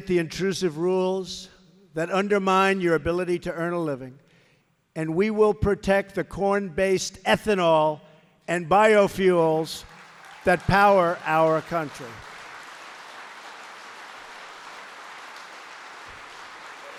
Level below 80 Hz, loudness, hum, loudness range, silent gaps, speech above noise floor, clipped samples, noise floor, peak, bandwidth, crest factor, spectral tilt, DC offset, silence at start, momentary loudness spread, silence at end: -50 dBFS; -23 LUFS; none; 19 LU; none; 41 dB; under 0.1%; -64 dBFS; -6 dBFS; 15 kHz; 18 dB; -5.5 dB/octave; under 0.1%; 0 s; 21 LU; 0 s